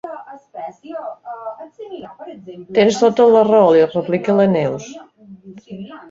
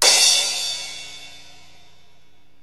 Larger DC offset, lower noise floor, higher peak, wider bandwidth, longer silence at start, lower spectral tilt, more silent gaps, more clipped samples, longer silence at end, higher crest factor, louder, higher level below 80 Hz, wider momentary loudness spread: second, under 0.1% vs 0.9%; second, -40 dBFS vs -59 dBFS; about the same, -2 dBFS vs 0 dBFS; second, 7.6 kHz vs 16 kHz; about the same, 0.05 s vs 0 s; first, -6 dB/octave vs 2.5 dB/octave; neither; neither; second, 0.1 s vs 1.25 s; second, 16 dB vs 22 dB; about the same, -14 LUFS vs -16 LUFS; first, -60 dBFS vs -66 dBFS; about the same, 24 LU vs 25 LU